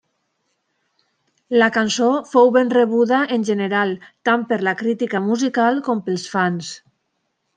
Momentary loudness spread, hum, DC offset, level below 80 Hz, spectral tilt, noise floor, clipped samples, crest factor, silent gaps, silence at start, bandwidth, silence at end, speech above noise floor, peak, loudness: 8 LU; none; under 0.1%; -70 dBFS; -5 dB/octave; -72 dBFS; under 0.1%; 18 dB; none; 1.5 s; 9.4 kHz; 0.8 s; 54 dB; -2 dBFS; -18 LUFS